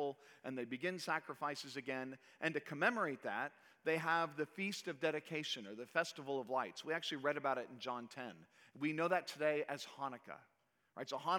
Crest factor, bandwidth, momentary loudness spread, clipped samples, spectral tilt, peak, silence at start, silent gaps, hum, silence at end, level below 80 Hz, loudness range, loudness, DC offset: 22 dB; 19.5 kHz; 12 LU; under 0.1%; -4 dB/octave; -18 dBFS; 0 s; none; none; 0 s; under -90 dBFS; 2 LU; -41 LUFS; under 0.1%